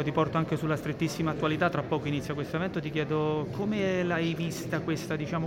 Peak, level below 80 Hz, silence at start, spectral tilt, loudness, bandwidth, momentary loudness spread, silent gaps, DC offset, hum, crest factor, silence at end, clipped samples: -12 dBFS; -56 dBFS; 0 s; -6.5 dB/octave; -30 LUFS; 16.5 kHz; 4 LU; none; under 0.1%; none; 18 dB; 0 s; under 0.1%